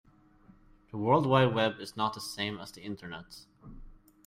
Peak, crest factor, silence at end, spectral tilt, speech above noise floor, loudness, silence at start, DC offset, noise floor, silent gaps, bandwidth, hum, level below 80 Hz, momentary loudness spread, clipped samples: -12 dBFS; 20 dB; 0.35 s; -6 dB/octave; 30 dB; -30 LUFS; 0.95 s; under 0.1%; -60 dBFS; none; 16 kHz; none; -58 dBFS; 20 LU; under 0.1%